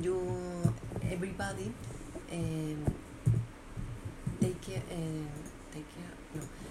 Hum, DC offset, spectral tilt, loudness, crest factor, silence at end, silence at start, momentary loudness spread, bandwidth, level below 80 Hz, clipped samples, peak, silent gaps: none; under 0.1%; -6.5 dB/octave; -38 LUFS; 22 dB; 0 s; 0 s; 12 LU; 14 kHz; -50 dBFS; under 0.1%; -14 dBFS; none